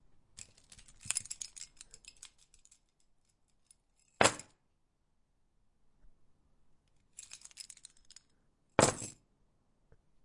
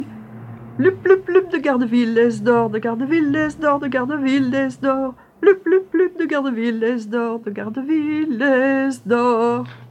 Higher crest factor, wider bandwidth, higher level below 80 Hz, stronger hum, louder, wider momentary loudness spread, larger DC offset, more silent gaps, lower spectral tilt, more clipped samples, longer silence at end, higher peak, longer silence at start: first, 36 dB vs 18 dB; first, 11.5 kHz vs 10 kHz; second, -66 dBFS vs -58 dBFS; neither; second, -33 LUFS vs -18 LUFS; first, 26 LU vs 9 LU; neither; neither; second, -2.5 dB/octave vs -6.5 dB/octave; neither; first, 1.15 s vs 0.05 s; second, -6 dBFS vs -2 dBFS; first, 1.05 s vs 0 s